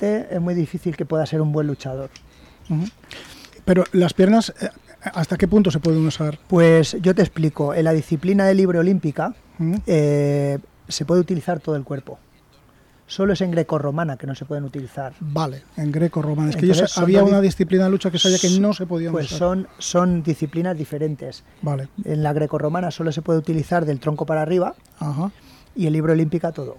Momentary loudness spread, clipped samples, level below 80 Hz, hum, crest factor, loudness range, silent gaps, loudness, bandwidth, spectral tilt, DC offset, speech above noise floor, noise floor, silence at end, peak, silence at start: 14 LU; under 0.1%; -48 dBFS; none; 14 dB; 7 LU; none; -20 LUFS; 13 kHz; -6 dB/octave; under 0.1%; 33 dB; -53 dBFS; 0.05 s; -6 dBFS; 0 s